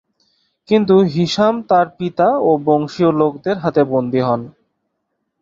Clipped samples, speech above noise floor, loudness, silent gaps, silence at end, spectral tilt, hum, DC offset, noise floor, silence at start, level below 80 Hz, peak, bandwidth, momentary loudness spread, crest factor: under 0.1%; 58 dB; -16 LUFS; none; 0.9 s; -7 dB/octave; none; under 0.1%; -73 dBFS; 0.7 s; -56 dBFS; -2 dBFS; 7.6 kHz; 5 LU; 14 dB